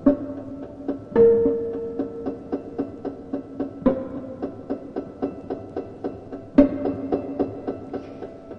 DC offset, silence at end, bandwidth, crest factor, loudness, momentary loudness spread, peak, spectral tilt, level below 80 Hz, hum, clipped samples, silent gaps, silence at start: under 0.1%; 0 s; 5.6 kHz; 24 dB; -25 LUFS; 16 LU; 0 dBFS; -10 dB/octave; -48 dBFS; none; under 0.1%; none; 0 s